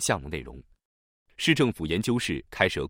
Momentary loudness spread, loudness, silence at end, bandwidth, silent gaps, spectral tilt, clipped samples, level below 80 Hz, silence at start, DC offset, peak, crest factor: 14 LU; -27 LUFS; 0 s; 16.5 kHz; 0.85-1.26 s; -4 dB/octave; under 0.1%; -50 dBFS; 0 s; under 0.1%; -4 dBFS; 24 dB